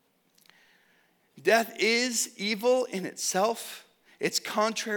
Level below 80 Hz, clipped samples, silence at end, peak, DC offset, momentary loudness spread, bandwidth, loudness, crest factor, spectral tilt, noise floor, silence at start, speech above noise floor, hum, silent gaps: -88 dBFS; under 0.1%; 0 s; -8 dBFS; under 0.1%; 9 LU; 19.5 kHz; -27 LUFS; 22 dB; -2 dB/octave; -66 dBFS; 1.35 s; 39 dB; none; none